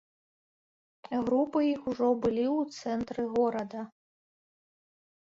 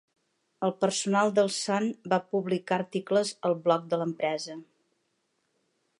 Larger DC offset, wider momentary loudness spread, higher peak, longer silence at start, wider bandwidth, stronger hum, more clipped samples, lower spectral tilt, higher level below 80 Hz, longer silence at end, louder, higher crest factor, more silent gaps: neither; about the same, 9 LU vs 7 LU; second, -14 dBFS vs -10 dBFS; first, 1.1 s vs 0.6 s; second, 7.8 kHz vs 11.5 kHz; neither; neither; first, -6.5 dB/octave vs -4.5 dB/octave; first, -64 dBFS vs -82 dBFS; about the same, 1.3 s vs 1.35 s; about the same, -30 LUFS vs -28 LUFS; about the same, 16 dB vs 18 dB; neither